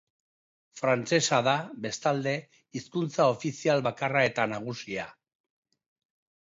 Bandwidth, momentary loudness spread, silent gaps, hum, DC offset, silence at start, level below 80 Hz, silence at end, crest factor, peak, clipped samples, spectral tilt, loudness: 8 kHz; 11 LU; none; none; under 0.1%; 0.75 s; -72 dBFS; 1.35 s; 20 dB; -10 dBFS; under 0.1%; -4.5 dB/octave; -28 LUFS